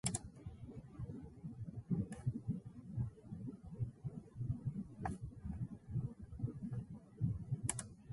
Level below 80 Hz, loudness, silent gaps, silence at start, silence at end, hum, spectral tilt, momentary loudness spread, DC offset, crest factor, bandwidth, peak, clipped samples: -58 dBFS; -46 LUFS; none; 0.05 s; 0 s; none; -5.5 dB/octave; 10 LU; under 0.1%; 24 dB; 11.5 kHz; -20 dBFS; under 0.1%